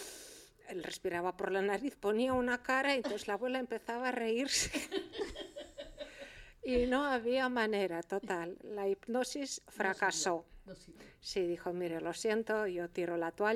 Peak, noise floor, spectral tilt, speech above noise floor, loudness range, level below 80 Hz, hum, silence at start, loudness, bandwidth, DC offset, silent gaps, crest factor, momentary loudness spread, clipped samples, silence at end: -18 dBFS; -55 dBFS; -3 dB/octave; 20 dB; 3 LU; -60 dBFS; none; 0 s; -36 LUFS; 16 kHz; under 0.1%; none; 18 dB; 16 LU; under 0.1%; 0 s